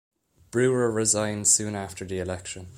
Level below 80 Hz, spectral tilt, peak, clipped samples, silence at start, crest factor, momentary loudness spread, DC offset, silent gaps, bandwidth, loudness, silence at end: -58 dBFS; -3.5 dB/octave; -6 dBFS; under 0.1%; 0.55 s; 20 dB; 13 LU; under 0.1%; none; 16 kHz; -24 LUFS; 0 s